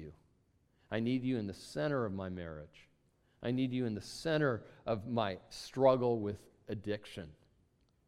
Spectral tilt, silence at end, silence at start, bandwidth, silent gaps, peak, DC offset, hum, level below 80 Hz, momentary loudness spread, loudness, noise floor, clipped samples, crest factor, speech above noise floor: -6.5 dB/octave; 0.75 s; 0 s; 13.5 kHz; none; -16 dBFS; under 0.1%; none; -66 dBFS; 17 LU; -36 LUFS; -73 dBFS; under 0.1%; 22 dB; 37 dB